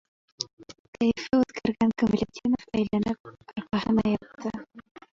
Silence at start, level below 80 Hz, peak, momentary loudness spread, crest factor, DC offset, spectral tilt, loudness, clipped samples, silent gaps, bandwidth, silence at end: 0.4 s; -54 dBFS; -8 dBFS; 12 LU; 18 dB; under 0.1%; -6 dB/octave; -27 LUFS; under 0.1%; 0.53-0.57 s, 0.79-0.93 s, 3.20-3.24 s; 7.4 kHz; 0.3 s